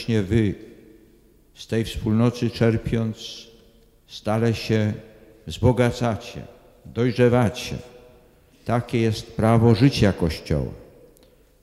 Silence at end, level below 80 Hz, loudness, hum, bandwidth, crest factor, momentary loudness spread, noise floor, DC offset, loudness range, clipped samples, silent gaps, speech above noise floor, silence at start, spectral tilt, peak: 0.8 s; -42 dBFS; -22 LUFS; none; 13 kHz; 18 dB; 18 LU; -55 dBFS; under 0.1%; 4 LU; under 0.1%; none; 33 dB; 0 s; -7 dB/octave; -4 dBFS